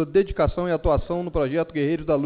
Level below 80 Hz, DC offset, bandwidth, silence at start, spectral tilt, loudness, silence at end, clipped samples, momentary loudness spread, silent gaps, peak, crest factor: -34 dBFS; under 0.1%; 4.8 kHz; 0 s; -12 dB/octave; -24 LUFS; 0 s; under 0.1%; 3 LU; none; -10 dBFS; 14 dB